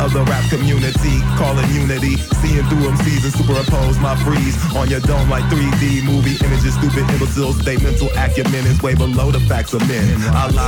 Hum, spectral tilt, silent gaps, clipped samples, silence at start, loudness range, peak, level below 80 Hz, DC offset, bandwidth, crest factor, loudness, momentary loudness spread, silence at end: none; -6 dB/octave; none; under 0.1%; 0 s; 0 LU; -4 dBFS; -20 dBFS; under 0.1%; 18.5 kHz; 12 dB; -16 LUFS; 2 LU; 0 s